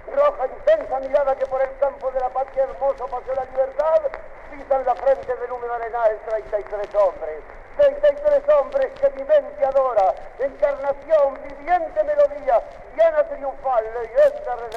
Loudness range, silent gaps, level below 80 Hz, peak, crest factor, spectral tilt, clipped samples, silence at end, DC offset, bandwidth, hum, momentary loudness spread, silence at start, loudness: 4 LU; none; -44 dBFS; -8 dBFS; 14 dB; -5.5 dB/octave; under 0.1%; 0 s; under 0.1%; 6.6 kHz; none; 9 LU; 0 s; -21 LUFS